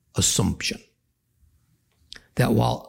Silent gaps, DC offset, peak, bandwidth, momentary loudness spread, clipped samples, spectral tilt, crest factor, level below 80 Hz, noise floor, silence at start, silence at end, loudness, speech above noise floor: none; under 0.1%; -8 dBFS; 17 kHz; 22 LU; under 0.1%; -4 dB/octave; 18 dB; -46 dBFS; -70 dBFS; 0.15 s; 0 s; -23 LUFS; 48 dB